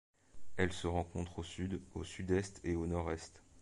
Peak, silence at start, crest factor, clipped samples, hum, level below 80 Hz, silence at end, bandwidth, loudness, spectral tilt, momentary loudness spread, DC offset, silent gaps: -18 dBFS; 0.15 s; 22 dB; under 0.1%; none; -50 dBFS; 0 s; 11.5 kHz; -40 LUFS; -6 dB/octave; 8 LU; under 0.1%; none